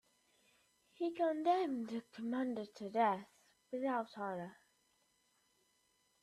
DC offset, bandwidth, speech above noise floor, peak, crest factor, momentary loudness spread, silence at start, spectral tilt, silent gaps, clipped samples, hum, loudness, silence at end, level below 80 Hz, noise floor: under 0.1%; 13 kHz; 39 dB; -22 dBFS; 20 dB; 10 LU; 1 s; -6.5 dB/octave; none; under 0.1%; none; -39 LUFS; 1.7 s; -88 dBFS; -77 dBFS